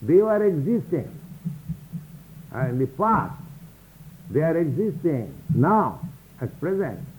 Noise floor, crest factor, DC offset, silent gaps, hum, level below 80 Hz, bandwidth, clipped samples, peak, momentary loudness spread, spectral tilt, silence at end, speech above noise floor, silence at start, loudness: -46 dBFS; 16 dB; under 0.1%; none; none; -54 dBFS; 19.5 kHz; under 0.1%; -8 dBFS; 19 LU; -9.5 dB/octave; 0 s; 24 dB; 0 s; -24 LUFS